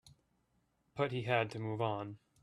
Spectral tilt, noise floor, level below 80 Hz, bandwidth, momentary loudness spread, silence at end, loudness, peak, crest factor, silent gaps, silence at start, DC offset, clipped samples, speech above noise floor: -7 dB/octave; -78 dBFS; -74 dBFS; 11.5 kHz; 12 LU; 0.25 s; -37 LUFS; -18 dBFS; 22 dB; none; 0.05 s; under 0.1%; under 0.1%; 41 dB